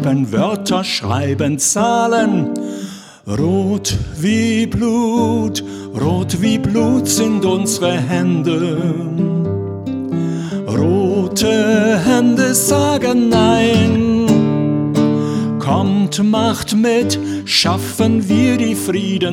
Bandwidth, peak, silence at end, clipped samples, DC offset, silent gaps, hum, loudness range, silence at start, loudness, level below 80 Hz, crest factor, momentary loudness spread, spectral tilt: 16.5 kHz; -2 dBFS; 0 s; under 0.1%; under 0.1%; none; none; 4 LU; 0 s; -15 LUFS; -42 dBFS; 14 dB; 7 LU; -5 dB/octave